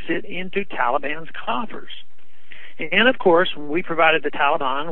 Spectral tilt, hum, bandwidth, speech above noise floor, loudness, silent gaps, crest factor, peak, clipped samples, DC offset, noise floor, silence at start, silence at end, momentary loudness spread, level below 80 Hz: -8 dB/octave; none; 4.2 kHz; 28 dB; -20 LUFS; none; 20 dB; -2 dBFS; under 0.1%; 7%; -49 dBFS; 0 s; 0 s; 16 LU; -62 dBFS